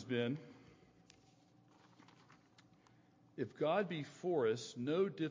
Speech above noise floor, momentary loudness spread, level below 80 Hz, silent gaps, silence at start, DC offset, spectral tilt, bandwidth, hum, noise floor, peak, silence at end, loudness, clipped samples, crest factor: 30 dB; 11 LU; -84 dBFS; none; 0 s; under 0.1%; -6 dB/octave; 7.6 kHz; none; -68 dBFS; -24 dBFS; 0 s; -39 LUFS; under 0.1%; 18 dB